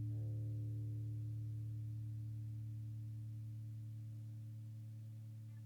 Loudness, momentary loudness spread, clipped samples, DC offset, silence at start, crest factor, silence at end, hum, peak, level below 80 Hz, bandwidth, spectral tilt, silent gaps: -48 LUFS; 8 LU; under 0.1%; under 0.1%; 0 s; 8 dB; 0 s; 60 Hz at -75 dBFS; -38 dBFS; -66 dBFS; 2.3 kHz; -9 dB/octave; none